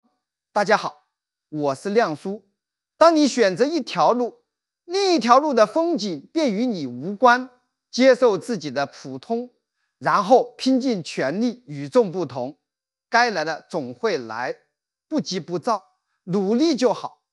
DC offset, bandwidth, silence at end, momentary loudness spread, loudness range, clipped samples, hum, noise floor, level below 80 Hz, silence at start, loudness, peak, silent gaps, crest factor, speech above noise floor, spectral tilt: under 0.1%; 11.5 kHz; 0.25 s; 14 LU; 6 LU; under 0.1%; none; -86 dBFS; -80 dBFS; 0.55 s; -21 LUFS; 0 dBFS; none; 22 dB; 66 dB; -4.5 dB/octave